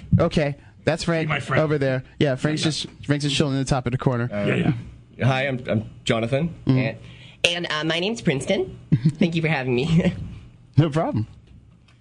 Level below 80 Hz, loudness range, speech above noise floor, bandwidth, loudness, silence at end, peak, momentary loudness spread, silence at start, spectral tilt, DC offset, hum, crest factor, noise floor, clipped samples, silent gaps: -46 dBFS; 1 LU; 27 dB; 10.5 kHz; -23 LUFS; 0.45 s; 0 dBFS; 7 LU; 0 s; -6 dB/octave; under 0.1%; none; 22 dB; -49 dBFS; under 0.1%; none